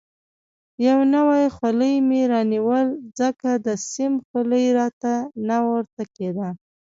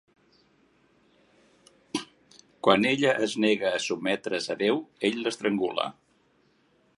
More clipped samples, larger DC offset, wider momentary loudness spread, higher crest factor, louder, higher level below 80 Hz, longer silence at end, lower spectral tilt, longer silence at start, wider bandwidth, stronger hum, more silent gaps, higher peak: neither; neither; second, 10 LU vs 13 LU; second, 14 dB vs 24 dB; first, -21 LUFS vs -27 LUFS; first, -64 dBFS vs -72 dBFS; second, 0.3 s vs 1.05 s; first, -5.5 dB/octave vs -4 dB/octave; second, 0.8 s vs 1.95 s; second, 7.8 kHz vs 11.5 kHz; neither; first, 4.25-4.34 s, 4.93-5.01 s, 5.93-5.97 s vs none; about the same, -8 dBFS vs -6 dBFS